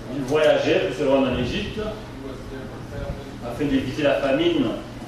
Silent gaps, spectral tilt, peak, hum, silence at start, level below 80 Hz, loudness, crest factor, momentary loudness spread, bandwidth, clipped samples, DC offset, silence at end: none; -6 dB/octave; -6 dBFS; none; 0 s; -40 dBFS; -22 LUFS; 16 dB; 16 LU; 13.5 kHz; under 0.1%; under 0.1%; 0 s